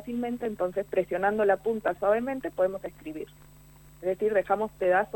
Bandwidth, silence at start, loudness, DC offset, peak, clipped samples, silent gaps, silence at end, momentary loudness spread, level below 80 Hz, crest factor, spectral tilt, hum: 18 kHz; 0 s; -28 LUFS; under 0.1%; -10 dBFS; under 0.1%; none; 0.1 s; 13 LU; -58 dBFS; 18 dB; -6.5 dB/octave; 50 Hz at -55 dBFS